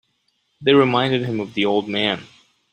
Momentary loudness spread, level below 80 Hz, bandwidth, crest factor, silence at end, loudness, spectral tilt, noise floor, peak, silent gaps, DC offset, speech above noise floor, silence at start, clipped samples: 9 LU; -60 dBFS; 8.8 kHz; 18 dB; 0.5 s; -19 LUFS; -6.5 dB/octave; -68 dBFS; -2 dBFS; none; under 0.1%; 49 dB; 0.6 s; under 0.1%